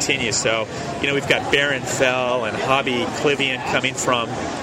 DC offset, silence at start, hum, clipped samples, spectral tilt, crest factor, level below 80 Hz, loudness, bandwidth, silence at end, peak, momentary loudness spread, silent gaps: under 0.1%; 0 s; none; under 0.1%; -3 dB/octave; 18 dB; -50 dBFS; -20 LUFS; 16 kHz; 0 s; -2 dBFS; 4 LU; none